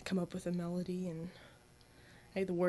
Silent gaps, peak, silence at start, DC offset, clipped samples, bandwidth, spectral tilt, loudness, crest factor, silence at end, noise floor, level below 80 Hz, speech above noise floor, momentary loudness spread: none; -22 dBFS; 0 s; under 0.1%; under 0.1%; 11 kHz; -7 dB/octave; -40 LUFS; 18 dB; 0 s; -62 dBFS; -68 dBFS; 25 dB; 21 LU